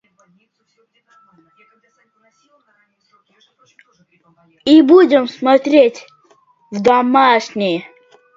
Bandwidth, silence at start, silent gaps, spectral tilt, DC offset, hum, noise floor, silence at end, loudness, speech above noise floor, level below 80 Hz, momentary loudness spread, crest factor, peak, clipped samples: 7.6 kHz; 4.65 s; none; -5.5 dB/octave; under 0.1%; none; -60 dBFS; 0.55 s; -13 LUFS; 45 dB; -64 dBFS; 12 LU; 16 dB; 0 dBFS; under 0.1%